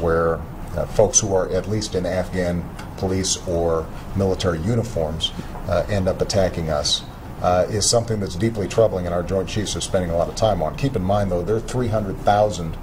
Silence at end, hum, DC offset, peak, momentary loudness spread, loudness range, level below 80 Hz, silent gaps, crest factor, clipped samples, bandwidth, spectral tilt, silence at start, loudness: 0 s; none; under 0.1%; -2 dBFS; 7 LU; 2 LU; -34 dBFS; none; 18 dB; under 0.1%; 16.5 kHz; -4.5 dB/octave; 0 s; -21 LUFS